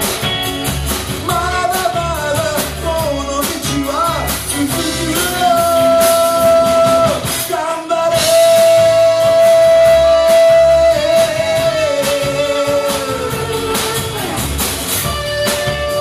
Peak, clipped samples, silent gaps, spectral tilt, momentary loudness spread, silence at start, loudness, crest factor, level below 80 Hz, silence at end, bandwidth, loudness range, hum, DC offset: 0 dBFS; under 0.1%; none; -3.5 dB/octave; 9 LU; 0 s; -13 LUFS; 12 dB; -32 dBFS; 0 s; 15.5 kHz; 7 LU; none; under 0.1%